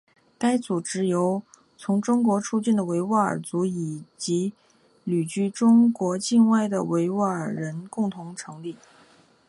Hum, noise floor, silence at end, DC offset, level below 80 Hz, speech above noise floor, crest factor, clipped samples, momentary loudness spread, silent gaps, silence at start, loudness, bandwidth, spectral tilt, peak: none; -57 dBFS; 0.75 s; under 0.1%; -70 dBFS; 33 dB; 16 dB; under 0.1%; 14 LU; none; 0.4 s; -24 LUFS; 11.5 kHz; -6 dB/octave; -8 dBFS